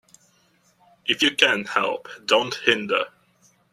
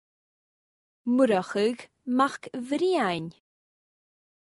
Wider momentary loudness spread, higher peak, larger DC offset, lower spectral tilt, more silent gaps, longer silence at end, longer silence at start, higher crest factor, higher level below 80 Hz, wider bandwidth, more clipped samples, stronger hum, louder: about the same, 12 LU vs 14 LU; first, 0 dBFS vs -10 dBFS; neither; second, -2.5 dB/octave vs -5.5 dB/octave; neither; second, 0.65 s vs 1.1 s; about the same, 1.05 s vs 1.05 s; first, 24 dB vs 18 dB; about the same, -70 dBFS vs -72 dBFS; first, 14 kHz vs 11.5 kHz; neither; neither; first, -21 LUFS vs -26 LUFS